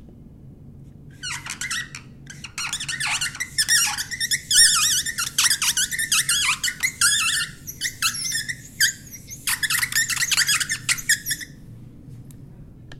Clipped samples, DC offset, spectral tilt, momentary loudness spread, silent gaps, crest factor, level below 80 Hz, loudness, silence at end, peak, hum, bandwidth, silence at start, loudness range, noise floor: under 0.1%; under 0.1%; 1.5 dB/octave; 13 LU; none; 22 dB; -50 dBFS; -20 LUFS; 0 s; -2 dBFS; none; 16.5 kHz; 0 s; 6 LU; -44 dBFS